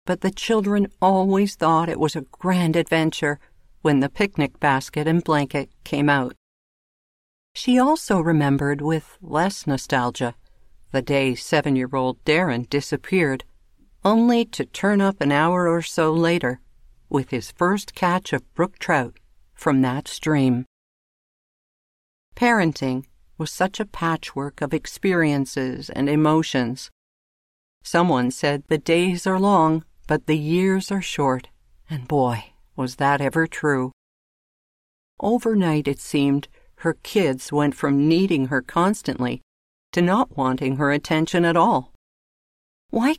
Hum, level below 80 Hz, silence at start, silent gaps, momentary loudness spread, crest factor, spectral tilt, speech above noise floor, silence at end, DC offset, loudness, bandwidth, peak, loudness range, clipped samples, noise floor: none; -52 dBFS; 0.05 s; 6.37-7.55 s, 20.67-22.32 s, 26.92-27.81 s, 33.93-35.17 s, 39.43-39.93 s, 41.95-42.89 s; 9 LU; 16 dB; -6 dB/octave; 33 dB; 0 s; under 0.1%; -21 LUFS; 15.5 kHz; -6 dBFS; 4 LU; under 0.1%; -54 dBFS